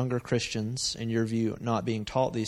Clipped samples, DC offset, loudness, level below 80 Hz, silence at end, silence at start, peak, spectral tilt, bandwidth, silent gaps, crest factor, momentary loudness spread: under 0.1%; under 0.1%; -30 LUFS; -56 dBFS; 0 s; 0 s; -12 dBFS; -5 dB/octave; 12.5 kHz; none; 16 dB; 2 LU